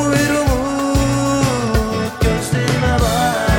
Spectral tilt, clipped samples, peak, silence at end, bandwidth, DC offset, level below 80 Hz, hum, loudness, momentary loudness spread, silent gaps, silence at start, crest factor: -5 dB/octave; under 0.1%; -2 dBFS; 0 s; 17 kHz; under 0.1%; -24 dBFS; none; -17 LUFS; 3 LU; none; 0 s; 14 dB